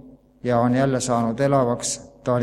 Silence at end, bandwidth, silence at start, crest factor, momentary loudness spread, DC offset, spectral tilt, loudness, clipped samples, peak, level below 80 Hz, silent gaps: 0 s; 13 kHz; 0.05 s; 16 dB; 8 LU; under 0.1%; -5.5 dB/octave; -22 LUFS; under 0.1%; -6 dBFS; -52 dBFS; none